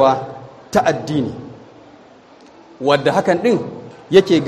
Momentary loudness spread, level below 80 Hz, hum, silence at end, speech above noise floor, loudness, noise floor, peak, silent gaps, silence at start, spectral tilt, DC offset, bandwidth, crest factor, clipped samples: 20 LU; -54 dBFS; none; 0 s; 29 dB; -17 LUFS; -44 dBFS; 0 dBFS; none; 0 s; -6 dB/octave; under 0.1%; 13 kHz; 18 dB; under 0.1%